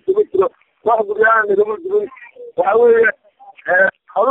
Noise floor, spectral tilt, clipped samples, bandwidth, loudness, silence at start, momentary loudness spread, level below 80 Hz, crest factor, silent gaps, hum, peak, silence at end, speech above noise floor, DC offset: -41 dBFS; -7.5 dB/octave; under 0.1%; 3.9 kHz; -15 LUFS; 0.05 s; 10 LU; -62 dBFS; 14 dB; none; none; -2 dBFS; 0 s; 28 dB; under 0.1%